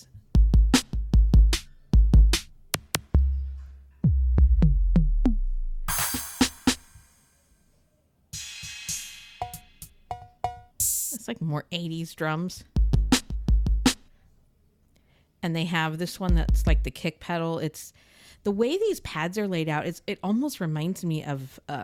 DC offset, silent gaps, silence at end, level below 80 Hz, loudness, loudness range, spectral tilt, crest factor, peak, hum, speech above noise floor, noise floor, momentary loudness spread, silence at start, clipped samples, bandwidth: under 0.1%; none; 0 s; -26 dBFS; -26 LUFS; 7 LU; -5 dB/octave; 16 dB; -8 dBFS; none; 39 dB; -66 dBFS; 15 LU; 0.15 s; under 0.1%; 18 kHz